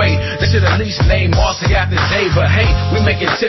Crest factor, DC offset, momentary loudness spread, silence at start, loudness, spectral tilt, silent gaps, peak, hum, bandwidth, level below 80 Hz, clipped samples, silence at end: 12 dB; under 0.1%; 2 LU; 0 s; -14 LUFS; -5.5 dB/octave; none; -2 dBFS; none; 6.2 kHz; -20 dBFS; under 0.1%; 0 s